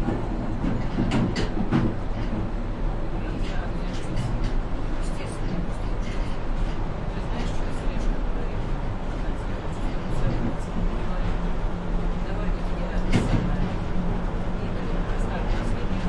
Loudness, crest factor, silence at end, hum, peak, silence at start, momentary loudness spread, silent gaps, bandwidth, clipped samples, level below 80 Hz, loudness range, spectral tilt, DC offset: -29 LUFS; 16 dB; 0 s; none; -8 dBFS; 0 s; 6 LU; none; 10 kHz; under 0.1%; -26 dBFS; 3 LU; -7 dB/octave; under 0.1%